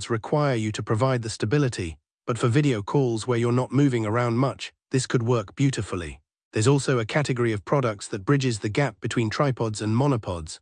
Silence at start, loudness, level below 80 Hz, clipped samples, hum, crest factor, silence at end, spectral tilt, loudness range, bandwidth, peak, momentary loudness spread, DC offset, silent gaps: 0 s; -24 LUFS; -54 dBFS; under 0.1%; none; 16 dB; 0.05 s; -6 dB/octave; 1 LU; 10 kHz; -8 dBFS; 9 LU; under 0.1%; 2.14-2.18 s, 6.43-6.51 s